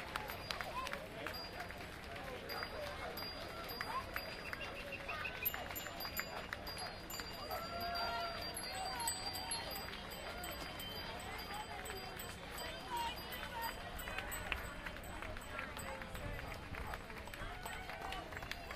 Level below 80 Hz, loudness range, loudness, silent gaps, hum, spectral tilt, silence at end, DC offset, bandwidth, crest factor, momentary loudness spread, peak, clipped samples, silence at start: -56 dBFS; 4 LU; -44 LUFS; none; none; -2.5 dB/octave; 0 s; under 0.1%; 15.5 kHz; 28 dB; 7 LU; -18 dBFS; under 0.1%; 0 s